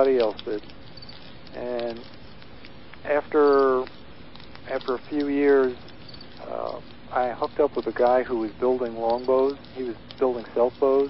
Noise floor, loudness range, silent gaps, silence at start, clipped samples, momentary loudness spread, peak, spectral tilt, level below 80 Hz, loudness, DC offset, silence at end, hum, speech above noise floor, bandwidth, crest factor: -46 dBFS; 3 LU; none; 0 s; under 0.1%; 23 LU; -8 dBFS; -8.5 dB/octave; -56 dBFS; -24 LUFS; 0.7%; 0 s; none; 22 dB; 5.8 kHz; 18 dB